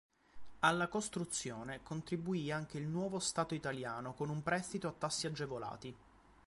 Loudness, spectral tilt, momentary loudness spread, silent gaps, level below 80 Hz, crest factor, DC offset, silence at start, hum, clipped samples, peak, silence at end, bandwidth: -39 LUFS; -4 dB/octave; 10 LU; none; -68 dBFS; 22 dB; under 0.1%; 0.35 s; none; under 0.1%; -18 dBFS; 0.4 s; 11.5 kHz